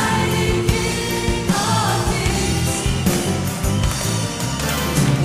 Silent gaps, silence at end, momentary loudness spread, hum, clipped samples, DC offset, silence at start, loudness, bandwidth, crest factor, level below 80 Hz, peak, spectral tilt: none; 0 s; 3 LU; none; under 0.1%; under 0.1%; 0 s; -19 LUFS; 16 kHz; 16 dB; -28 dBFS; -2 dBFS; -4.5 dB/octave